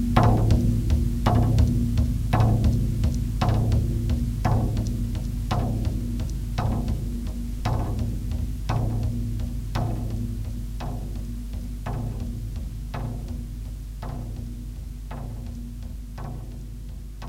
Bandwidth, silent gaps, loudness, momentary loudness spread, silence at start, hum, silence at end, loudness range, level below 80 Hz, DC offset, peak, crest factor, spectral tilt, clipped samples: 16 kHz; none; -27 LUFS; 15 LU; 0 s; none; 0 s; 12 LU; -28 dBFS; under 0.1%; -4 dBFS; 22 dB; -7.5 dB/octave; under 0.1%